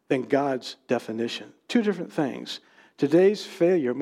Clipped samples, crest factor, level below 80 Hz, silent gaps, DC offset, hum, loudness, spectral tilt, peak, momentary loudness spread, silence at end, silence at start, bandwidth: under 0.1%; 18 dB; -84 dBFS; none; under 0.1%; none; -25 LUFS; -6 dB/octave; -8 dBFS; 14 LU; 0 s; 0.1 s; 13 kHz